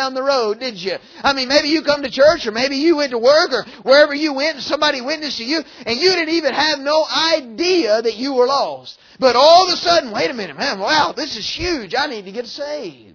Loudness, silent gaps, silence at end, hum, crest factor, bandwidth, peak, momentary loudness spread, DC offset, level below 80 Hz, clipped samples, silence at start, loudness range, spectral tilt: -16 LUFS; none; 0.2 s; none; 16 dB; 5.4 kHz; 0 dBFS; 11 LU; under 0.1%; -50 dBFS; under 0.1%; 0 s; 2 LU; -2.5 dB/octave